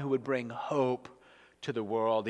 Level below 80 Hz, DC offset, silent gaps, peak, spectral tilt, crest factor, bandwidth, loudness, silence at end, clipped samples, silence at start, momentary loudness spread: -78 dBFS; under 0.1%; none; -18 dBFS; -7 dB/octave; 16 dB; 10 kHz; -33 LUFS; 0 s; under 0.1%; 0 s; 10 LU